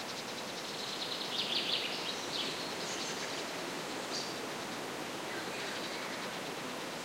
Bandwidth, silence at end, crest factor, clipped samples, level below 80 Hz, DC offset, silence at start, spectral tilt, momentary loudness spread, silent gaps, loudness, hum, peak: 16 kHz; 0 s; 18 dB; under 0.1%; -78 dBFS; under 0.1%; 0 s; -2 dB/octave; 7 LU; none; -37 LUFS; none; -22 dBFS